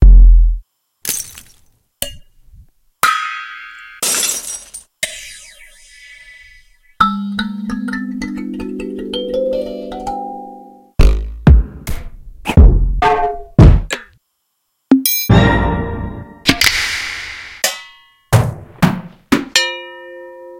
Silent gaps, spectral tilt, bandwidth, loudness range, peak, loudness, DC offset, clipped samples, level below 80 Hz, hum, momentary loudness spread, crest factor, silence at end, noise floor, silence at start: none; -4.5 dB/octave; 17 kHz; 8 LU; 0 dBFS; -16 LUFS; under 0.1%; 0.6%; -18 dBFS; none; 19 LU; 14 dB; 0 s; -68 dBFS; 0 s